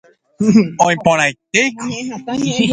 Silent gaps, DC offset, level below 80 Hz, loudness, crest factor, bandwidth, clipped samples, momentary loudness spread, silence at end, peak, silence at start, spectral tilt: none; under 0.1%; -54 dBFS; -15 LUFS; 16 dB; 9.4 kHz; under 0.1%; 11 LU; 0 s; 0 dBFS; 0.4 s; -4.5 dB/octave